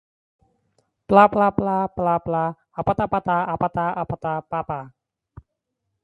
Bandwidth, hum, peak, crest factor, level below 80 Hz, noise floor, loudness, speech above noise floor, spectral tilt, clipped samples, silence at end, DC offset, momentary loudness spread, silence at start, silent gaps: 10.5 kHz; none; 0 dBFS; 22 dB; -50 dBFS; -79 dBFS; -21 LUFS; 58 dB; -9 dB/octave; under 0.1%; 1.15 s; under 0.1%; 12 LU; 1.1 s; none